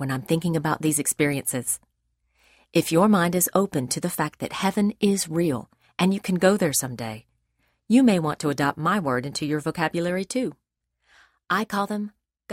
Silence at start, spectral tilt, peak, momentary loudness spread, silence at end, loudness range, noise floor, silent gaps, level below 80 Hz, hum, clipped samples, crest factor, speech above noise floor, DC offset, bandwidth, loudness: 0 s; -4.5 dB/octave; -6 dBFS; 9 LU; 0 s; 4 LU; -73 dBFS; none; -60 dBFS; none; under 0.1%; 18 dB; 49 dB; under 0.1%; 16 kHz; -24 LUFS